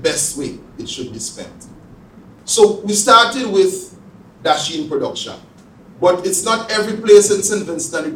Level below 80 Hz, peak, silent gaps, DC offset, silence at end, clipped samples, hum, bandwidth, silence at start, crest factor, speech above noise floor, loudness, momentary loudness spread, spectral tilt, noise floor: -54 dBFS; 0 dBFS; none; under 0.1%; 0 s; under 0.1%; none; 16.5 kHz; 0 s; 16 dB; 27 dB; -15 LUFS; 19 LU; -2.5 dB/octave; -43 dBFS